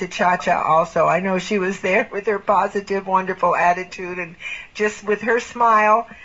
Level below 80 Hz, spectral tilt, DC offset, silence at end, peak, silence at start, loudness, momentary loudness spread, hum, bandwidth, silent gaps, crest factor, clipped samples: -56 dBFS; -3.5 dB/octave; 0.2%; 0 s; -4 dBFS; 0 s; -19 LUFS; 12 LU; none; 8 kHz; none; 16 dB; under 0.1%